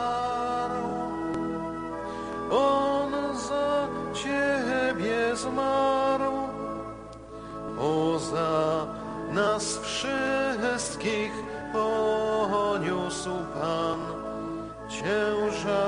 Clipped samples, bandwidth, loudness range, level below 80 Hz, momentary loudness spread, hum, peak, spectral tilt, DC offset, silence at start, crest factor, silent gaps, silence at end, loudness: under 0.1%; 10 kHz; 2 LU; -54 dBFS; 10 LU; none; -12 dBFS; -4.5 dB/octave; under 0.1%; 0 s; 16 dB; none; 0 s; -28 LUFS